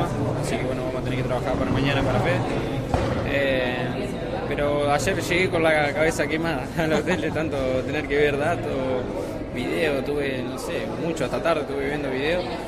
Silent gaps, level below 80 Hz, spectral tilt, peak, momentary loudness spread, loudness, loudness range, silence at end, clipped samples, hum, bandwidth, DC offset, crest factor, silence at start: none; -40 dBFS; -5.5 dB/octave; -8 dBFS; 6 LU; -24 LUFS; 3 LU; 0 s; under 0.1%; none; 14.5 kHz; under 0.1%; 16 dB; 0 s